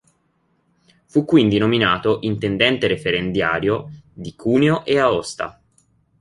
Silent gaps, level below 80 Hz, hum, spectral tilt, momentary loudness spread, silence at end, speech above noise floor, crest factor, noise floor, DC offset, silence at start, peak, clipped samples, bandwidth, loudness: none; -50 dBFS; none; -6 dB/octave; 13 LU; 0.7 s; 47 dB; 18 dB; -65 dBFS; under 0.1%; 1.15 s; -2 dBFS; under 0.1%; 11.5 kHz; -18 LUFS